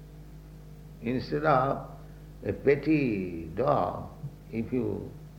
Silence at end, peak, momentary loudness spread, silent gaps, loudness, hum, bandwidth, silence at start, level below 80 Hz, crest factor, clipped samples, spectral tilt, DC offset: 0 s; -10 dBFS; 23 LU; none; -29 LUFS; none; 16.5 kHz; 0 s; -50 dBFS; 20 dB; under 0.1%; -8.5 dB/octave; under 0.1%